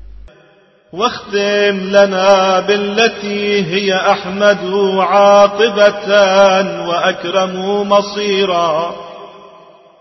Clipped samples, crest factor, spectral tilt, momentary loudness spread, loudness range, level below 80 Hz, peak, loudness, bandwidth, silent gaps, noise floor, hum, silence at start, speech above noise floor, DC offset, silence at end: under 0.1%; 14 dB; -4 dB/octave; 9 LU; 3 LU; -48 dBFS; 0 dBFS; -12 LUFS; 6.2 kHz; none; -49 dBFS; none; 0.95 s; 37 dB; under 0.1%; 0.55 s